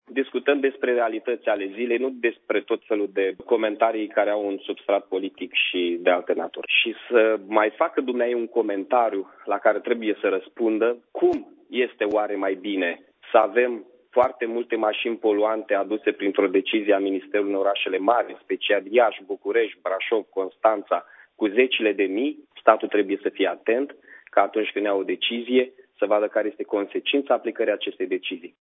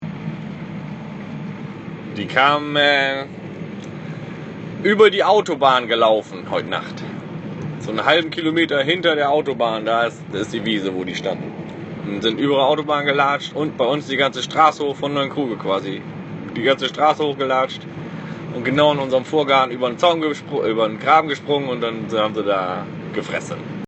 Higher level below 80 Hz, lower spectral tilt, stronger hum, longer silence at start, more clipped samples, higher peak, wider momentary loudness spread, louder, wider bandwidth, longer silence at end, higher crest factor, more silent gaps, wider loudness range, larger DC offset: second, -72 dBFS vs -60 dBFS; first, -6.5 dB/octave vs -5 dB/octave; neither; about the same, 0.1 s vs 0 s; neither; about the same, 0 dBFS vs 0 dBFS; second, 7 LU vs 16 LU; second, -23 LUFS vs -19 LUFS; second, 4 kHz vs 8.4 kHz; first, 0.15 s vs 0 s; about the same, 22 dB vs 20 dB; neither; about the same, 2 LU vs 3 LU; neither